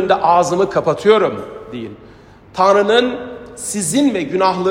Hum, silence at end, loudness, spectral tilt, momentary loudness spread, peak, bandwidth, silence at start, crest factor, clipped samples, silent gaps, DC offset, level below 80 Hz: none; 0 s; -15 LUFS; -4 dB/octave; 17 LU; 0 dBFS; 16 kHz; 0 s; 16 dB; under 0.1%; none; under 0.1%; -52 dBFS